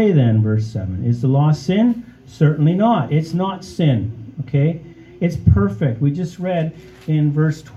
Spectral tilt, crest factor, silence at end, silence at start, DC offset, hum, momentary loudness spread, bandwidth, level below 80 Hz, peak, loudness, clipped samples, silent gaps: -8.5 dB/octave; 18 dB; 0 s; 0 s; under 0.1%; none; 8 LU; 7.8 kHz; -40 dBFS; 0 dBFS; -18 LUFS; under 0.1%; none